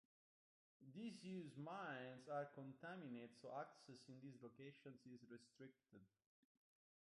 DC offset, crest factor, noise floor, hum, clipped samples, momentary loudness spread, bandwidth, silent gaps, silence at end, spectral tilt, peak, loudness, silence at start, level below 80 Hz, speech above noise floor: under 0.1%; 20 dB; under -90 dBFS; none; under 0.1%; 12 LU; 11 kHz; none; 0.95 s; -6 dB/octave; -38 dBFS; -57 LUFS; 0.8 s; under -90 dBFS; over 33 dB